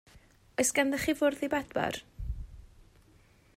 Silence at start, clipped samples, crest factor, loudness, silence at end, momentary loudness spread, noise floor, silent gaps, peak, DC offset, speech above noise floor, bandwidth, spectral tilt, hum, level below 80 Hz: 0.15 s; under 0.1%; 18 dB; -31 LUFS; 0.9 s; 15 LU; -61 dBFS; none; -14 dBFS; under 0.1%; 32 dB; 16 kHz; -3.5 dB/octave; none; -48 dBFS